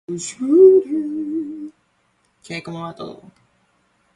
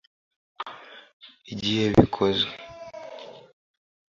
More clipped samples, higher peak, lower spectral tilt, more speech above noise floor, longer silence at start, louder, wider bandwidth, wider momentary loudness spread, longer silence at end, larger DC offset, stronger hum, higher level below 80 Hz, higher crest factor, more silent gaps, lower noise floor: neither; about the same, -2 dBFS vs 0 dBFS; about the same, -6 dB/octave vs -6 dB/octave; first, 47 dB vs 22 dB; second, 0.1 s vs 0.6 s; first, -16 LUFS vs -23 LUFS; first, 10.5 kHz vs 7.6 kHz; about the same, 24 LU vs 25 LU; first, 1 s vs 0.8 s; neither; neither; second, -64 dBFS vs -48 dBFS; second, 18 dB vs 28 dB; second, none vs 1.13-1.20 s; first, -64 dBFS vs -44 dBFS